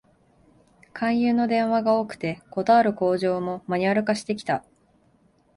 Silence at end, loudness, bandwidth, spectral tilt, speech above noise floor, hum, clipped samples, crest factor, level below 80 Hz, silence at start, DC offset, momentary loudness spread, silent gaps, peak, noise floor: 0.95 s; -23 LUFS; 11.5 kHz; -6.5 dB/octave; 39 dB; none; under 0.1%; 16 dB; -64 dBFS; 0.95 s; under 0.1%; 10 LU; none; -8 dBFS; -61 dBFS